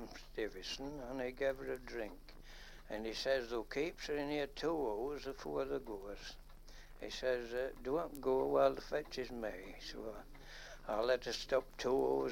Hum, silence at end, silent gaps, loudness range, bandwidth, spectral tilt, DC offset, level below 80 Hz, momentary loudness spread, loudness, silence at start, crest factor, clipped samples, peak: none; 0 s; none; 4 LU; 16.5 kHz; -4.5 dB/octave; under 0.1%; -56 dBFS; 18 LU; -40 LUFS; 0 s; 22 dB; under 0.1%; -18 dBFS